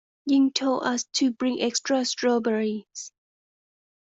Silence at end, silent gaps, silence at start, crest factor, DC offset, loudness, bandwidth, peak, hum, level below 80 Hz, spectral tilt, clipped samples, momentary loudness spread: 0.95 s; none; 0.25 s; 16 dB; under 0.1%; -24 LUFS; 8 kHz; -10 dBFS; none; -72 dBFS; -3 dB/octave; under 0.1%; 12 LU